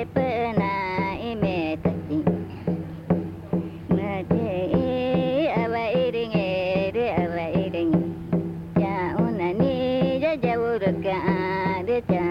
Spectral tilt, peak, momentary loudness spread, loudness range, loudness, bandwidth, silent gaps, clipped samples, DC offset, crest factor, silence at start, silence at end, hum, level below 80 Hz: -9 dB/octave; -8 dBFS; 4 LU; 3 LU; -25 LUFS; 5.6 kHz; none; under 0.1%; under 0.1%; 16 dB; 0 s; 0 s; none; -50 dBFS